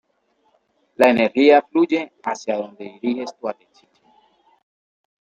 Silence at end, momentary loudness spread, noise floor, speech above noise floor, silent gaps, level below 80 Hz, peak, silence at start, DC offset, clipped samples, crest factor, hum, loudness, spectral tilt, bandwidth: 1.7 s; 16 LU; -65 dBFS; 47 dB; none; -68 dBFS; -2 dBFS; 1 s; under 0.1%; under 0.1%; 20 dB; none; -19 LUFS; -5 dB/octave; 16 kHz